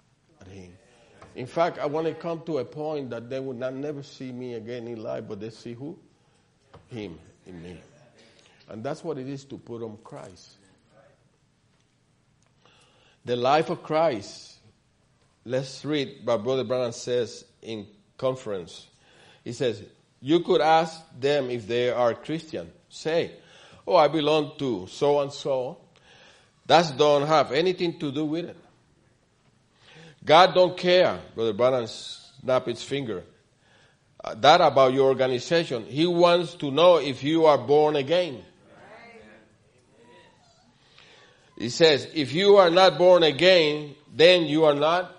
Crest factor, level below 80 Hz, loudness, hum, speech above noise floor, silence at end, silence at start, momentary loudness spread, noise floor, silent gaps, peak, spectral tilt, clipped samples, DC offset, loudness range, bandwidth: 24 dB; -68 dBFS; -23 LUFS; none; 42 dB; 0.05 s; 0.45 s; 21 LU; -65 dBFS; none; -2 dBFS; -5 dB/octave; under 0.1%; under 0.1%; 18 LU; 10.5 kHz